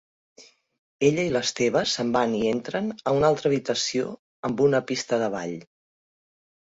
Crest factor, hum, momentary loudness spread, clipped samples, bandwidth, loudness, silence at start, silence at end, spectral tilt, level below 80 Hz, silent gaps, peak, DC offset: 18 dB; none; 10 LU; under 0.1%; 8 kHz; -24 LUFS; 0.4 s; 1 s; -4.5 dB/octave; -60 dBFS; 0.78-0.99 s, 4.19-4.43 s; -8 dBFS; under 0.1%